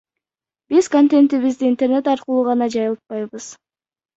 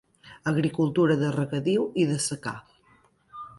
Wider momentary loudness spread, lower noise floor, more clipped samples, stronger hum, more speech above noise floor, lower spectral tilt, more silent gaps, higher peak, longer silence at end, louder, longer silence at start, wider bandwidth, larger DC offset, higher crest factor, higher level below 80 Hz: about the same, 14 LU vs 13 LU; first, under -90 dBFS vs -61 dBFS; neither; neither; first, over 73 dB vs 37 dB; about the same, -5 dB/octave vs -5.5 dB/octave; neither; first, -4 dBFS vs -10 dBFS; first, 0.65 s vs 0.05 s; first, -17 LUFS vs -26 LUFS; first, 0.7 s vs 0.25 s; second, 8 kHz vs 11.5 kHz; neither; about the same, 14 dB vs 16 dB; about the same, -66 dBFS vs -64 dBFS